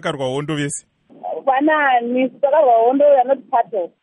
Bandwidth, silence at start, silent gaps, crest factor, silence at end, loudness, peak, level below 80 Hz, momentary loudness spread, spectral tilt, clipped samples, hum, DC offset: 11.5 kHz; 0.05 s; none; 12 dB; 0.15 s; -16 LUFS; -4 dBFS; -66 dBFS; 11 LU; -5 dB/octave; under 0.1%; none; under 0.1%